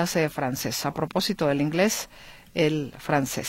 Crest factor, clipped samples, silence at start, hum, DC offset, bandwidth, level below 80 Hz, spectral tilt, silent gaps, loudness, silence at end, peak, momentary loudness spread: 18 dB; under 0.1%; 0 s; none; under 0.1%; 16.5 kHz; -54 dBFS; -4.5 dB/octave; none; -26 LUFS; 0 s; -8 dBFS; 7 LU